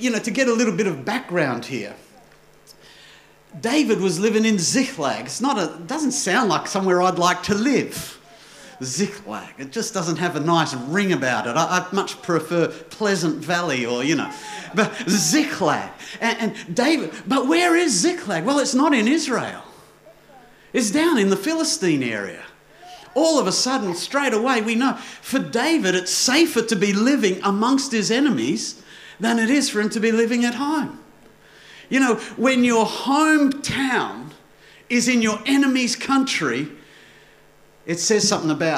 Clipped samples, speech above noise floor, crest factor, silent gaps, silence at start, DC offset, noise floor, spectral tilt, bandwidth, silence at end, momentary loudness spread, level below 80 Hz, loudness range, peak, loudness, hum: under 0.1%; 31 dB; 18 dB; none; 0 s; under 0.1%; -51 dBFS; -3.5 dB/octave; 16 kHz; 0 s; 10 LU; -62 dBFS; 4 LU; -4 dBFS; -20 LUFS; none